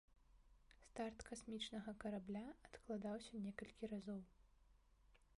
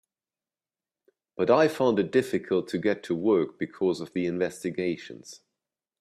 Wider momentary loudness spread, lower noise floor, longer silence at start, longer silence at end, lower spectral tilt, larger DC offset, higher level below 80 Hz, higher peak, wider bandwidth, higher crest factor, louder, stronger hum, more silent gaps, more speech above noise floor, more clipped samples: second, 7 LU vs 14 LU; second, -73 dBFS vs under -90 dBFS; second, 0.1 s vs 1.4 s; second, 0.15 s vs 0.65 s; about the same, -5 dB/octave vs -6 dB/octave; neither; about the same, -72 dBFS vs -70 dBFS; second, -34 dBFS vs -8 dBFS; second, 11.5 kHz vs 13.5 kHz; about the same, 18 dB vs 20 dB; second, -51 LUFS vs -26 LUFS; neither; neither; second, 23 dB vs over 64 dB; neither